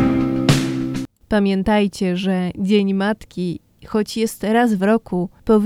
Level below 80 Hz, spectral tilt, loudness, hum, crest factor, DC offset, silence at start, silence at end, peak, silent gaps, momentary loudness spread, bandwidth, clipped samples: -42 dBFS; -6.5 dB/octave; -19 LUFS; none; 18 dB; under 0.1%; 0 s; 0 s; 0 dBFS; none; 9 LU; 15.5 kHz; under 0.1%